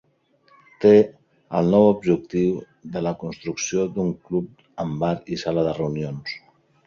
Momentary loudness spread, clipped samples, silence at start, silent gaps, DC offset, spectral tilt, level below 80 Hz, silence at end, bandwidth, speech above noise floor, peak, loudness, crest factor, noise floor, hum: 15 LU; under 0.1%; 0.8 s; none; under 0.1%; -6.5 dB/octave; -54 dBFS; 0.5 s; 7.2 kHz; 40 dB; -4 dBFS; -22 LUFS; 20 dB; -61 dBFS; none